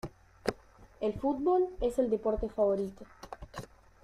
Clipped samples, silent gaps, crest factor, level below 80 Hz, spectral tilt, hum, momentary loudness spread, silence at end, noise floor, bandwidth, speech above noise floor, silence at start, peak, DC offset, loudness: under 0.1%; none; 24 dB; -50 dBFS; -7 dB/octave; none; 19 LU; 0.4 s; -55 dBFS; 14.5 kHz; 24 dB; 0.05 s; -10 dBFS; under 0.1%; -32 LUFS